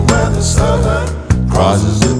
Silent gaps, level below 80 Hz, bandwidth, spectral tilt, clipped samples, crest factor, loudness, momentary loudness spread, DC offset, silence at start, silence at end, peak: none; -20 dBFS; 11 kHz; -5.5 dB/octave; under 0.1%; 12 dB; -13 LUFS; 4 LU; under 0.1%; 0 s; 0 s; 0 dBFS